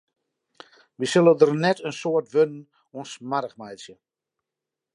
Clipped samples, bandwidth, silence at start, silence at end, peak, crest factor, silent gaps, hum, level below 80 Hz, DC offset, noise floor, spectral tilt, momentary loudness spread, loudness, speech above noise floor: under 0.1%; 11 kHz; 1 s; 1.05 s; -2 dBFS; 22 dB; none; none; -78 dBFS; under 0.1%; -87 dBFS; -5.5 dB/octave; 22 LU; -22 LUFS; 64 dB